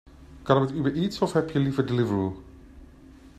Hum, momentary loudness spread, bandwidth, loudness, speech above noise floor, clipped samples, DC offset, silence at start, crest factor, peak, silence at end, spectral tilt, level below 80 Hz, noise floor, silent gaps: none; 8 LU; 13 kHz; -25 LUFS; 25 dB; under 0.1%; under 0.1%; 0.1 s; 20 dB; -6 dBFS; 0.1 s; -7.5 dB/octave; -52 dBFS; -49 dBFS; none